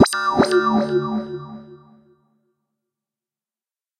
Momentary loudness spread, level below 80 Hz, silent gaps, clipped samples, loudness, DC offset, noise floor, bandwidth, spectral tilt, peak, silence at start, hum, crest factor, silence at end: 19 LU; -56 dBFS; none; under 0.1%; -19 LUFS; under 0.1%; under -90 dBFS; 14 kHz; -5 dB/octave; -2 dBFS; 0 s; none; 22 dB; 2.25 s